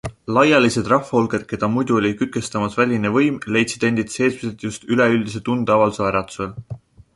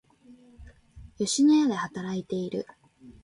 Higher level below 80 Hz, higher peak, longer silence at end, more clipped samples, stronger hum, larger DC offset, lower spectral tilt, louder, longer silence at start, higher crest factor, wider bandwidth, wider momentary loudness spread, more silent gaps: first, -50 dBFS vs -58 dBFS; first, -2 dBFS vs -14 dBFS; first, 0.4 s vs 0.1 s; neither; neither; neither; about the same, -5.5 dB/octave vs -4.5 dB/octave; first, -19 LUFS vs -26 LUFS; second, 0.05 s vs 0.3 s; about the same, 18 dB vs 14 dB; about the same, 11.5 kHz vs 11.5 kHz; about the same, 12 LU vs 14 LU; neither